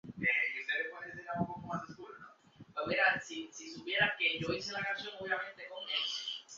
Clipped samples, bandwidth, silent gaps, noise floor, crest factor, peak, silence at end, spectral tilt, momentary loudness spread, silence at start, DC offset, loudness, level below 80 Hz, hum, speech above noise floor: under 0.1%; 7.6 kHz; none; -58 dBFS; 22 dB; -16 dBFS; 0 s; -1 dB/octave; 16 LU; 0.05 s; under 0.1%; -35 LUFS; -70 dBFS; none; 23 dB